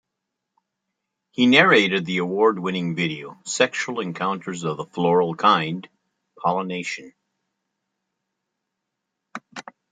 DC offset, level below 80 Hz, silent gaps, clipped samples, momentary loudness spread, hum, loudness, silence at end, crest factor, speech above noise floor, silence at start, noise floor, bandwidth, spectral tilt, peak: under 0.1%; -70 dBFS; none; under 0.1%; 19 LU; none; -21 LUFS; 0.3 s; 22 dB; 60 dB; 1.4 s; -81 dBFS; 9.6 kHz; -4.5 dB/octave; -2 dBFS